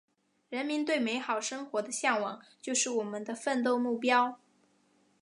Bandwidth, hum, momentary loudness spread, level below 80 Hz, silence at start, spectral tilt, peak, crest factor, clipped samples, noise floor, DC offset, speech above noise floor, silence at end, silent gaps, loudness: 11.5 kHz; none; 10 LU; -88 dBFS; 0.5 s; -2 dB/octave; -12 dBFS; 20 dB; under 0.1%; -69 dBFS; under 0.1%; 38 dB; 0.85 s; none; -31 LUFS